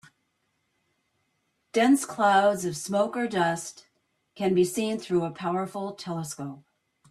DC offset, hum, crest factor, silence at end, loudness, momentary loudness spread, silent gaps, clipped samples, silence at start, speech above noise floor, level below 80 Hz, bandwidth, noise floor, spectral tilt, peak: under 0.1%; none; 16 dB; 0.5 s; -26 LUFS; 12 LU; none; under 0.1%; 1.75 s; 49 dB; -70 dBFS; 14 kHz; -75 dBFS; -5 dB/octave; -10 dBFS